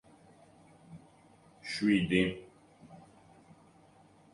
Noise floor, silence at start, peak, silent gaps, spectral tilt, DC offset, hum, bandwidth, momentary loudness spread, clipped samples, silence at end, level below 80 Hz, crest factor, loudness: -61 dBFS; 0.9 s; -14 dBFS; none; -6 dB/octave; under 0.1%; none; 11.5 kHz; 28 LU; under 0.1%; 1.35 s; -62 dBFS; 22 dB; -30 LUFS